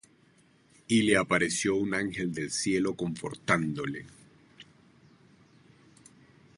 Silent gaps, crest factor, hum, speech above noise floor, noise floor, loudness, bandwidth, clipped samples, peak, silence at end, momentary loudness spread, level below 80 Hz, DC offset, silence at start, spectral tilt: none; 22 dB; none; 34 dB; -63 dBFS; -28 LUFS; 11.5 kHz; under 0.1%; -10 dBFS; 1.95 s; 11 LU; -62 dBFS; under 0.1%; 0.9 s; -4 dB/octave